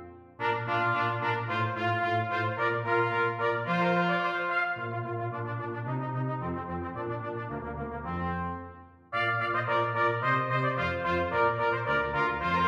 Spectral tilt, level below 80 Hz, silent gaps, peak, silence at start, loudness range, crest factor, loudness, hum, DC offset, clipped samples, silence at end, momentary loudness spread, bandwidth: -7.5 dB/octave; -54 dBFS; none; -14 dBFS; 0 s; 7 LU; 16 dB; -29 LUFS; none; under 0.1%; under 0.1%; 0 s; 9 LU; 7.6 kHz